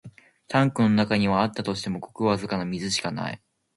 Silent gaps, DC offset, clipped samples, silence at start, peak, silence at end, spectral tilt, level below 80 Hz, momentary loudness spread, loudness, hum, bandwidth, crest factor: none; under 0.1%; under 0.1%; 0.05 s; -6 dBFS; 0.4 s; -5.5 dB/octave; -56 dBFS; 11 LU; -25 LUFS; none; 11.5 kHz; 20 dB